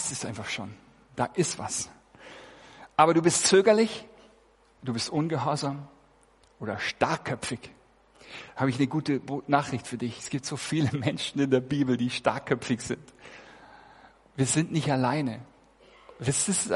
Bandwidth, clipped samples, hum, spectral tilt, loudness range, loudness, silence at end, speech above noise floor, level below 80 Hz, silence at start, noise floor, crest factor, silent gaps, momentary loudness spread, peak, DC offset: 11.5 kHz; under 0.1%; none; -4.5 dB/octave; 7 LU; -27 LUFS; 0 s; 34 dB; -62 dBFS; 0 s; -61 dBFS; 24 dB; none; 20 LU; -6 dBFS; under 0.1%